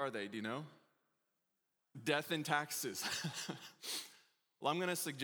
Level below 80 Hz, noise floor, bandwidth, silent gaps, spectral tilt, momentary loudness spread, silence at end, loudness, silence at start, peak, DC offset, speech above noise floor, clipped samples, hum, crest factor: under -90 dBFS; -86 dBFS; over 20 kHz; none; -3 dB/octave; 10 LU; 0 s; -40 LUFS; 0 s; -18 dBFS; under 0.1%; 46 dB; under 0.1%; none; 24 dB